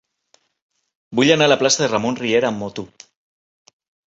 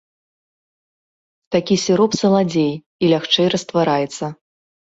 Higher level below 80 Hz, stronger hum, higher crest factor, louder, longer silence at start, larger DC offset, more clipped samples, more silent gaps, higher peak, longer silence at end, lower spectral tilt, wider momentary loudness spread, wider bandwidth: about the same, -60 dBFS vs -58 dBFS; neither; about the same, 20 dB vs 16 dB; about the same, -17 LUFS vs -17 LUFS; second, 1.1 s vs 1.5 s; neither; neither; second, none vs 2.86-2.99 s; first, 0 dBFS vs -4 dBFS; first, 1.25 s vs 0.6 s; second, -3.5 dB/octave vs -5 dB/octave; first, 16 LU vs 7 LU; about the same, 8.2 kHz vs 8 kHz